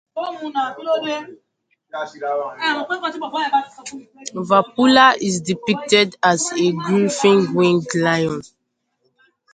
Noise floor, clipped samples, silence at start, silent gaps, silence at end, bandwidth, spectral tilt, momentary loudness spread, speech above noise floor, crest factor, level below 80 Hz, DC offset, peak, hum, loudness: -72 dBFS; under 0.1%; 0.15 s; none; 1.1 s; 9.4 kHz; -4 dB/octave; 16 LU; 54 dB; 20 dB; -62 dBFS; under 0.1%; 0 dBFS; none; -18 LUFS